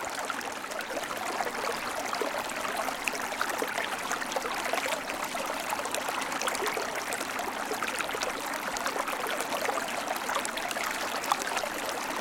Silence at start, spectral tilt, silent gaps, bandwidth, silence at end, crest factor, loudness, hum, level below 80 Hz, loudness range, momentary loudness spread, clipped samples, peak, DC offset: 0 s; -1 dB/octave; none; 17 kHz; 0 s; 26 dB; -31 LUFS; none; -64 dBFS; 1 LU; 3 LU; under 0.1%; -6 dBFS; under 0.1%